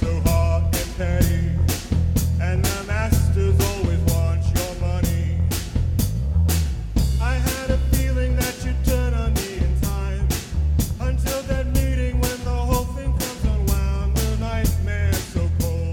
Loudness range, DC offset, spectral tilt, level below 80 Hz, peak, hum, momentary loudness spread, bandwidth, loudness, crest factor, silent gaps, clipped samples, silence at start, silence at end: 2 LU; under 0.1%; -5.5 dB/octave; -24 dBFS; -6 dBFS; none; 4 LU; 18 kHz; -22 LUFS; 16 dB; none; under 0.1%; 0 s; 0 s